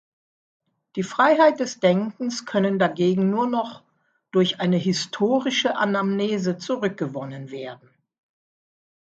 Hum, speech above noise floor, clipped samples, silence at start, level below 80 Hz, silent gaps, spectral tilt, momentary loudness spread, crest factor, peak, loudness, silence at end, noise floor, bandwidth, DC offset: none; 32 dB; under 0.1%; 0.95 s; -70 dBFS; none; -5.5 dB/octave; 14 LU; 20 dB; -4 dBFS; -22 LUFS; 1.35 s; -53 dBFS; 8 kHz; under 0.1%